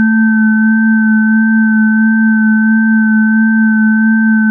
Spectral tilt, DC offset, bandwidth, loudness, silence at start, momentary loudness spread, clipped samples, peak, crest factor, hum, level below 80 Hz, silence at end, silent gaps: -16 dB/octave; under 0.1%; 1.7 kHz; -9 LUFS; 0 s; 0 LU; under 0.1%; -4 dBFS; 6 dB; none; -86 dBFS; 0 s; none